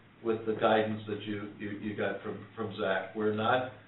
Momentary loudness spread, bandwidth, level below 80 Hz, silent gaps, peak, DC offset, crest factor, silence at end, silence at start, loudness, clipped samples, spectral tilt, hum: 12 LU; 4.1 kHz; -72 dBFS; none; -14 dBFS; under 0.1%; 18 dB; 0.05 s; 0.2 s; -33 LUFS; under 0.1%; -4 dB/octave; none